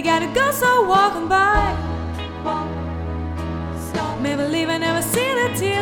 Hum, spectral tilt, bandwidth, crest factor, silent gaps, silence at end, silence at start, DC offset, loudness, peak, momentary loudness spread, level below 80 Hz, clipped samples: none; -4.5 dB/octave; over 20 kHz; 16 dB; none; 0 s; 0 s; under 0.1%; -20 LUFS; -4 dBFS; 11 LU; -34 dBFS; under 0.1%